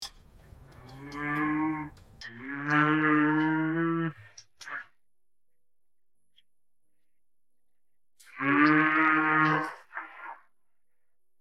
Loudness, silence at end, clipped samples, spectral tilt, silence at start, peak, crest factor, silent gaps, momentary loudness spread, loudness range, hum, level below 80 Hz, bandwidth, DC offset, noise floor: -26 LUFS; 1.05 s; under 0.1%; -6.5 dB/octave; 0 s; -8 dBFS; 22 dB; none; 22 LU; 14 LU; none; -64 dBFS; 10.5 kHz; under 0.1%; -90 dBFS